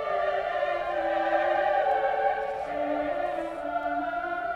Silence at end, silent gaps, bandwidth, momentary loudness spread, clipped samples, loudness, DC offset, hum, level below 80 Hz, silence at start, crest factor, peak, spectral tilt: 0 s; none; 9.2 kHz; 6 LU; under 0.1%; -28 LUFS; under 0.1%; none; -58 dBFS; 0 s; 14 dB; -14 dBFS; -5 dB/octave